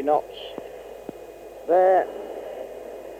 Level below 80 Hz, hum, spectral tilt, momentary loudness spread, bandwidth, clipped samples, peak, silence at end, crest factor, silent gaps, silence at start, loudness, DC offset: -60 dBFS; none; -5 dB/octave; 21 LU; 15.5 kHz; under 0.1%; -8 dBFS; 0 s; 16 dB; none; 0 s; -22 LUFS; under 0.1%